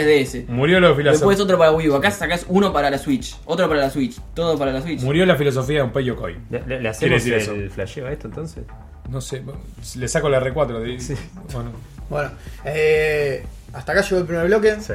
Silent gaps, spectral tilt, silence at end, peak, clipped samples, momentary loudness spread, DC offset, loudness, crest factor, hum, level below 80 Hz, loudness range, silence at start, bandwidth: none; -5.5 dB/octave; 0 s; 0 dBFS; under 0.1%; 16 LU; under 0.1%; -19 LUFS; 18 dB; none; -38 dBFS; 8 LU; 0 s; 16 kHz